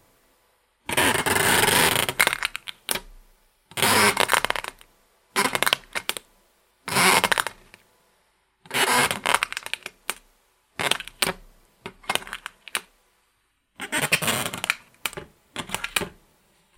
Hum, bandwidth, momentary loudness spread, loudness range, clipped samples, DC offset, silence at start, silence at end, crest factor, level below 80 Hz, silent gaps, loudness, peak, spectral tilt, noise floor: none; 16.5 kHz; 19 LU; 8 LU; under 0.1%; under 0.1%; 0.9 s; 0.7 s; 26 dB; -54 dBFS; none; -23 LUFS; 0 dBFS; -1.5 dB/octave; -69 dBFS